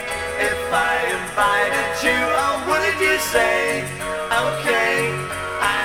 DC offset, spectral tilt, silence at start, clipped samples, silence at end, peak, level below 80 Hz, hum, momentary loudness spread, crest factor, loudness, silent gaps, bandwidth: 0.2%; -3 dB/octave; 0 s; under 0.1%; 0 s; -4 dBFS; -46 dBFS; none; 6 LU; 16 dB; -19 LUFS; none; 19 kHz